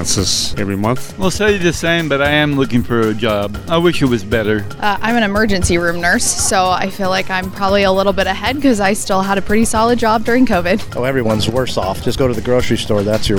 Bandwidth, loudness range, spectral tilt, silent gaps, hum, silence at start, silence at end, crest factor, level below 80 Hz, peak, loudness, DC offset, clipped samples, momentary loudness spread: 19.5 kHz; 1 LU; -4 dB/octave; none; none; 0 s; 0 s; 14 dB; -32 dBFS; 0 dBFS; -15 LUFS; under 0.1%; under 0.1%; 5 LU